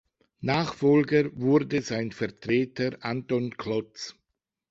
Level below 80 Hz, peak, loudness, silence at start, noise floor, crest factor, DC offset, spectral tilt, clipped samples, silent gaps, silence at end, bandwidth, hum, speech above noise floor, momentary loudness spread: -62 dBFS; -10 dBFS; -27 LUFS; 0.4 s; -83 dBFS; 18 dB; under 0.1%; -6.5 dB/octave; under 0.1%; none; 0.6 s; 7.8 kHz; none; 57 dB; 11 LU